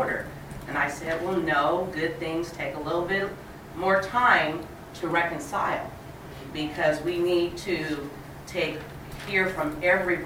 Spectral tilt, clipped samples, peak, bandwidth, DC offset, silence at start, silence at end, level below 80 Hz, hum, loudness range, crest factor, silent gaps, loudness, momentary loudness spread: -5 dB/octave; under 0.1%; -6 dBFS; 16.5 kHz; under 0.1%; 0 s; 0 s; -50 dBFS; none; 3 LU; 22 dB; none; -26 LUFS; 16 LU